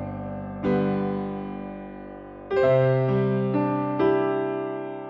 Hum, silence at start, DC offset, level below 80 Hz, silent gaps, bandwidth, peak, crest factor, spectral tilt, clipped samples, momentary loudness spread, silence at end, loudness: none; 0 s; under 0.1%; -54 dBFS; none; 5.6 kHz; -10 dBFS; 14 dB; -10 dB/octave; under 0.1%; 17 LU; 0 s; -25 LUFS